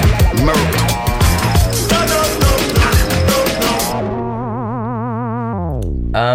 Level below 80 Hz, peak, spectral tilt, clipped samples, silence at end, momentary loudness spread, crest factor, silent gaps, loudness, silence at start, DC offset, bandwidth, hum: -20 dBFS; -2 dBFS; -4.5 dB/octave; under 0.1%; 0 s; 8 LU; 12 dB; none; -15 LUFS; 0 s; under 0.1%; 17 kHz; none